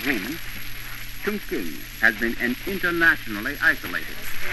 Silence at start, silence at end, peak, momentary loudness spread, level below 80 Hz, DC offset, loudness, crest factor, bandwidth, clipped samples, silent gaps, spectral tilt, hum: 0 s; 0 s; -2 dBFS; 15 LU; -40 dBFS; under 0.1%; -24 LUFS; 22 dB; 13.5 kHz; under 0.1%; none; -3.5 dB/octave; none